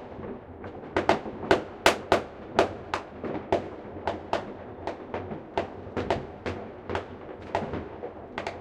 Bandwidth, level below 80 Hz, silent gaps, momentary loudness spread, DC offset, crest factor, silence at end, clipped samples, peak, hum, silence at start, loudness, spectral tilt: 16 kHz; -54 dBFS; none; 14 LU; under 0.1%; 30 dB; 0 s; under 0.1%; 0 dBFS; none; 0 s; -31 LUFS; -4.5 dB/octave